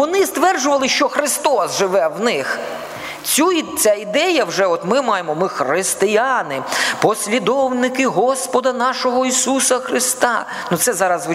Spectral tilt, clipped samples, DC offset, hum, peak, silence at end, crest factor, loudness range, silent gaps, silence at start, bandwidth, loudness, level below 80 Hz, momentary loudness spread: -2.5 dB/octave; under 0.1%; under 0.1%; none; 0 dBFS; 0 s; 16 dB; 1 LU; none; 0 s; 16 kHz; -17 LUFS; -62 dBFS; 5 LU